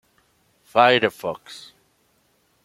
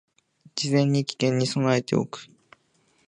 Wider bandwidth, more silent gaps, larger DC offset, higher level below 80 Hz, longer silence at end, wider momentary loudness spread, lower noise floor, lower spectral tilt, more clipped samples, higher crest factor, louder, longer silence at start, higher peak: first, 16 kHz vs 10.5 kHz; neither; neither; about the same, -68 dBFS vs -68 dBFS; first, 1.05 s vs 0.85 s; first, 24 LU vs 13 LU; about the same, -64 dBFS vs -66 dBFS; about the same, -4.5 dB/octave vs -5.5 dB/octave; neither; about the same, 22 dB vs 18 dB; first, -19 LUFS vs -24 LUFS; first, 0.75 s vs 0.55 s; first, -2 dBFS vs -8 dBFS